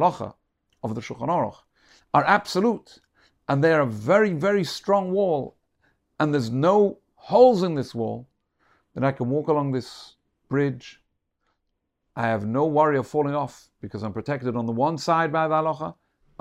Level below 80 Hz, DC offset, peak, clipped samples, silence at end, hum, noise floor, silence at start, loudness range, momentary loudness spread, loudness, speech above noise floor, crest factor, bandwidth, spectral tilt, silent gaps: -64 dBFS; under 0.1%; -4 dBFS; under 0.1%; 0.5 s; none; -77 dBFS; 0 s; 6 LU; 16 LU; -23 LUFS; 54 dB; 20 dB; 13.5 kHz; -7 dB/octave; none